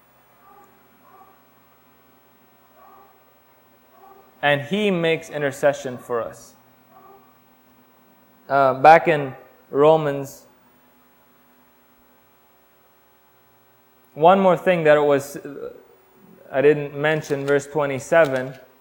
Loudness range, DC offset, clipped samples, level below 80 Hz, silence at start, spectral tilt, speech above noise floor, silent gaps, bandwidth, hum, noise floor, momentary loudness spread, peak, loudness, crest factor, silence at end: 8 LU; under 0.1%; under 0.1%; -64 dBFS; 4.4 s; -5.5 dB/octave; 38 dB; none; 18 kHz; none; -57 dBFS; 18 LU; 0 dBFS; -19 LUFS; 22 dB; 0.25 s